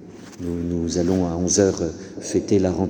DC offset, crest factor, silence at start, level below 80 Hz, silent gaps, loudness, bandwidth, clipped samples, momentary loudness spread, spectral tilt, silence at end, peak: under 0.1%; 18 dB; 0 s; -44 dBFS; none; -22 LUFS; 19.5 kHz; under 0.1%; 13 LU; -5.5 dB/octave; 0 s; -4 dBFS